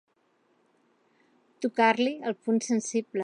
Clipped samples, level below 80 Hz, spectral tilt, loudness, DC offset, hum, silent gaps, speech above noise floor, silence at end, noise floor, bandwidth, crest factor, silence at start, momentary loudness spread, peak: under 0.1%; -86 dBFS; -4 dB/octave; -27 LUFS; under 0.1%; none; none; 43 dB; 0 s; -69 dBFS; 10.5 kHz; 20 dB; 1.6 s; 9 LU; -10 dBFS